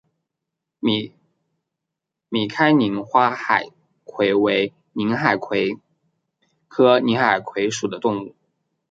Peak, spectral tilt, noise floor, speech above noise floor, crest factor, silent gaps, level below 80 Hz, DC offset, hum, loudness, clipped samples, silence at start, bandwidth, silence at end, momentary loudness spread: -2 dBFS; -5 dB/octave; -83 dBFS; 64 dB; 20 dB; none; -66 dBFS; under 0.1%; none; -20 LUFS; under 0.1%; 0.85 s; 9.2 kHz; 0.6 s; 12 LU